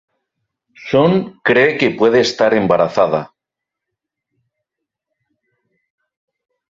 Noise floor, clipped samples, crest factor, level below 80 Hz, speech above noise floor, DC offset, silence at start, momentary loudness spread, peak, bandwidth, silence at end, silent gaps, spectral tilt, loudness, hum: -83 dBFS; under 0.1%; 16 dB; -56 dBFS; 69 dB; under 0.1%; 0.8 s; 5 LU; -2 dBFS; 7.8 kHz; 3.5 s; none; -5.5 dB/octave; -14 LUFS; none